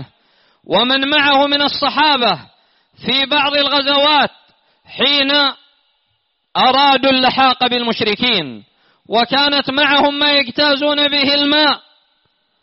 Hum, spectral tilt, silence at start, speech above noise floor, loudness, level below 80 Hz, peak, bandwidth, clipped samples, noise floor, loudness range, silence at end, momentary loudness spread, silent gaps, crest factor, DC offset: none; 0 dB/octave; 0 s; 52 dB; -13 LUFS; -54 dBFS; -2 dBFS; 6 kHz; under 0.1%; -66 dBFS; 2 LU; 0.85 s; 6 LU; none; 14 dB; under 0.1%